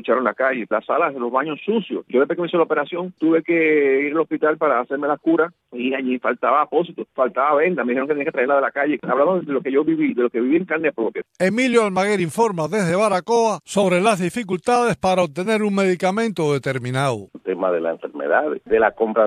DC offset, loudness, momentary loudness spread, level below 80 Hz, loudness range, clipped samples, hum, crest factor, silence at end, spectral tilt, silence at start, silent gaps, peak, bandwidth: under 0.1%; -20 LUFS; 6 LU; -62 dBFS; 2 LU; under 0.1%; none; 16 dB; 0 s; -5.5 dB/octave; 0.05 s; none; -2 dBFS; 14 kHz